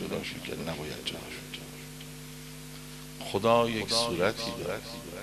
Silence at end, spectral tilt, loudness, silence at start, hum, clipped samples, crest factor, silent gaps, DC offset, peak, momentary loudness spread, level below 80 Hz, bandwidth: 0 s; -4 dB/octave; -31 LUFS; 0 s; 50 Hz at -50 dBFS; under 0.1%; 22 dB; none; under 0.1%; -10 dBFS; 18 LU; -56 dBFS; 14 kHz